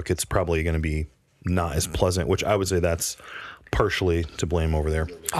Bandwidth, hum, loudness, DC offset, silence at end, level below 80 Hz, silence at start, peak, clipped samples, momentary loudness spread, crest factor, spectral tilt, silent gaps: 15 kHz; none; -25 LUFS; under 0.1%; 0 s; -34 dBFS; 0 s; -6 dBFS; under 0.1%; 9 LU; 18 dB; -5 dB/octave; none